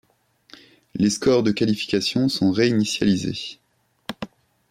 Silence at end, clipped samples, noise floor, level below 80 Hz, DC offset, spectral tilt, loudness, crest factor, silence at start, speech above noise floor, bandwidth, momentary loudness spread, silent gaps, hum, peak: 0.45 s; under 0.1%; -60 dBFS; -56 dBFS; under 0.1%; -5 dB/octave; -21 LUFS; 16 dB; 0.95 s; 40 dB; 15.5 kHz; 17 LU; none; none; -8 dBFS